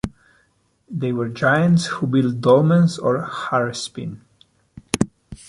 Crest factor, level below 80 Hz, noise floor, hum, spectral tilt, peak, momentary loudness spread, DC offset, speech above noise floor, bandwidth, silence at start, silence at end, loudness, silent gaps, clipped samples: 18 dB; -50 dBFS; -63 dBFS; none; -6.5 dB/octave; -2 dBFS; 14 LU; under 0.1%; 44 dB; 11.5 kHz; 0.05 s; 0.15 s; -19 LUFS; none; under 0.1%